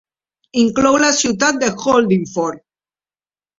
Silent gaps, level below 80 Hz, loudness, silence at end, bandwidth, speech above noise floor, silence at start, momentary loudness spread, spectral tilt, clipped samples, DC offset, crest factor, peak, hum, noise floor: none; -52 dBFS; -15 LUFS; 1 s; 8 kHz; over 75 dB; 0.55 s; 9 LU; -3.5 dB/octave; under 0.1%; under 0.1%; 16 dB; 0 dBFS; none; under -90 dBFS